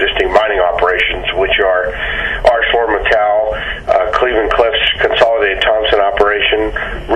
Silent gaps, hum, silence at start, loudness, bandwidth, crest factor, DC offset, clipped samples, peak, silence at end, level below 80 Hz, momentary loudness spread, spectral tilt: none; none; 0 s; -12 LUFS; 9.8 kHz; 12 dB; under 0.1%; under 0.1%; 0 dBFS; 0 s; -30 dBFS; 5 LU; -4.5 dB/octave